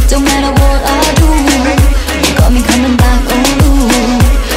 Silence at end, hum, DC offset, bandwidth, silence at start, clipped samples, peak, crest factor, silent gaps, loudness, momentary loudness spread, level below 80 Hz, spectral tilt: 0 s; none; under 0.1%; 16.5 kHz; 0 s; under 0.1%; 0 dBFS; 8 dB; none; -9 LUFS; 2 LU; -12 dBFS; -4.5 dB/octave